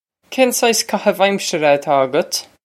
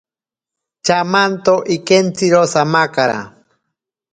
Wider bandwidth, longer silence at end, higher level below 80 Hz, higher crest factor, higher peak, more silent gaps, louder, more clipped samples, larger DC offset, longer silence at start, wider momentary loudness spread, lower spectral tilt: first, 16.5 kHz vs 9.4 kHz; second, 0.25 s vs 0.85 s; second, -70 dBFS vs -58 dBFS; about the same, 16 dB vs 16 dB; about the same, 0 dBFS vs 0 dBFS; neither; about the same, -16 LUFS vs -14 LUFS; neither; neither; second, 0.3 s vs 0.85 s; about the same, 5 LU vs 5 LU; second, -3 dB/octave vs -4.5 dB/octave